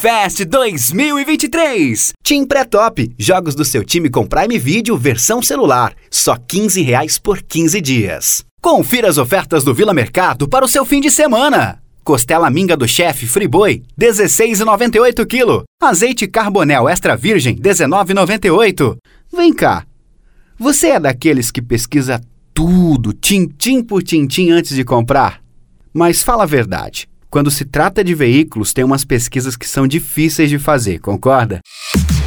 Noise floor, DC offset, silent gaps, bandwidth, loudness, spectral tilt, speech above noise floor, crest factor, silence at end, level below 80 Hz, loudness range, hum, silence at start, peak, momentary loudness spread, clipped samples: -46 dBFS; under 0.1%; 8.51-8.57 s, 15.67-15.78 s; over 20 kHz; -12 LUFS; -4 dB/octave; 34 dB; 12 dB; 0 s; -32 dBFS; 3 LU; none; 0 s; 0 dBFS; 5 LU; under 0.1%